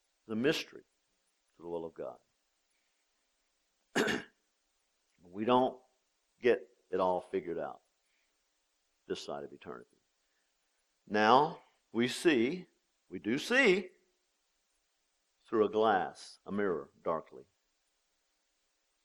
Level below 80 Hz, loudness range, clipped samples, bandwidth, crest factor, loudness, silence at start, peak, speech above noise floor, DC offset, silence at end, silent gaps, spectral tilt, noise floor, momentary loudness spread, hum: -78 dBFS; 11 LU; under 0.1%; 13.5 kHz; 24 dB; -33 LUFS; 0.3 s; -12 dBFS; 47 dB; under 0.1%; 1.65 s; none; -4.5 dB/octave; -79 dBFS; 20 LU; none